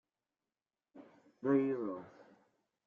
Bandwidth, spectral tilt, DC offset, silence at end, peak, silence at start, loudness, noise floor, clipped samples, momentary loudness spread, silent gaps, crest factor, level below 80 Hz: 3.6 kHz; -8.5 dB/octave; under 0.1%; 0.65 s; -20 dBFS; 0.95 s; -36 LUFS; under -90 dBFS; under 0.1%; 17 LU; none; 20 dB; -88 dBFS